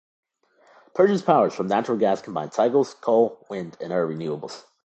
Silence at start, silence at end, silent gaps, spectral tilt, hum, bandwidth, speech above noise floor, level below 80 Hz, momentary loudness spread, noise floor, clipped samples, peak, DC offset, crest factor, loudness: 0.95 s; 0.25 s; none; -6.5 dB/octave; none; 8.6 kHz; 37 dB; -70 dBFS; 13 LU; -59 dBFS; under 0.1%; -2 dBFS; under 0.1%; 20 dB; -23 LUFS